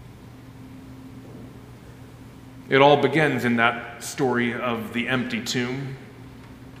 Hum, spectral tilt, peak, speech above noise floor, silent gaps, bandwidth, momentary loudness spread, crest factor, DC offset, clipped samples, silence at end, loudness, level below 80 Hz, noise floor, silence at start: none; -5 dB/octave; -2 dBFS; 21 dB; none; 16 kHz; 26 LU; 24 dB; under 0.1%; under 0.1%; 0 s; -22 LUFS; -56 dBFS; -43 dBFS; 0 s